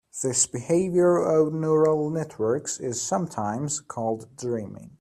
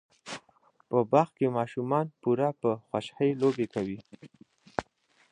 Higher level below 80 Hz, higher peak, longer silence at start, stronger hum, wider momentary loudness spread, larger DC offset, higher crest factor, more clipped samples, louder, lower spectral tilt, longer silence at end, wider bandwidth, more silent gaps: about the same, -64 dBFS vs -66 dBFS; about the same, -8 dBFS vs -8 dBFS; about the same, 0.15 s vs 0.25 s; neither; second, 10 LU vs 17 LU; neither; second, 16 dB vs 22 dB; neither; first, -25 LUFS vs -29 LUFS; second, -5 dB/octave vs -7.5 dB/octave; second, 0.1 s vs 0.5 s; first, 13.5 kHz vs 10.5 kHz; neither